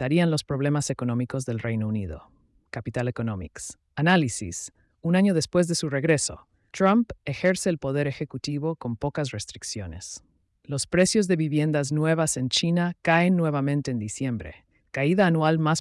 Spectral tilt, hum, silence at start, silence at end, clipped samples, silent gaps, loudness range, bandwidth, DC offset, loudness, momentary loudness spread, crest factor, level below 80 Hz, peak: -5 dB/octave; none; 0 s; 0 s; under 0.1%; none; 6 LU; 12 kHz; under 0.1%; -25 LUFS; 14 LU; 16 dB; -54 dBFS; -10 dBFS